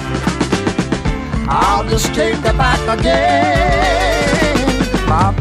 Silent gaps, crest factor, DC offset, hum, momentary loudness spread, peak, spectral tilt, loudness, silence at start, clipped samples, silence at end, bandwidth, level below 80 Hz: none; 14 dB; under 0.1%; none; 6 LU; 0 dBFS; -5 dB/octave; -14 LUFS; 0 s; under 0.1%; 0 s; 15.5 kHz; -22 dBFS